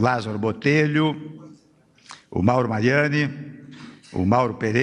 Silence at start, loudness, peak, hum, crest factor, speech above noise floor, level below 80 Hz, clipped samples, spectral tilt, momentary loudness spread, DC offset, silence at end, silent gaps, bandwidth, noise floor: 0 s; -21 LUFS; -2 dBFS; none; 20 dB; 36 dB; -56 dBFS; under 0.1%; -7 dB/octave; 21 LU; under 0.1%; 0 s; none; 10 kHz; -57 dBFS